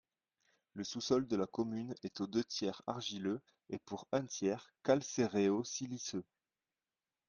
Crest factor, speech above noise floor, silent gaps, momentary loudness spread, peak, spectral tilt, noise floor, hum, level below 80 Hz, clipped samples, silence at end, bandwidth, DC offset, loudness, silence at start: 22 dB; over 52 dB; none; 11 LU; -18 dBFS; -4.5 dB/octave; under -90 dBFS; none; -76 dBFS; under 0.1%; 1.05 s; 10 kHz; under 0.1%; -38 LUFS; 0.75 s